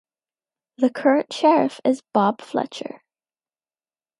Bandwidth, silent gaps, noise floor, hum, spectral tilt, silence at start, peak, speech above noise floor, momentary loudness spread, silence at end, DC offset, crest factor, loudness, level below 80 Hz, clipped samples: 11.5 kHz; none; under -90 dBFS; none; -5.5 dB/octave; 0.8 s; -4 dBFS; over 70 dB; 12 LU; 1.4 s; under 0.1%; 18 dB; -21 LUFS; -76 dBFS; under 0.1%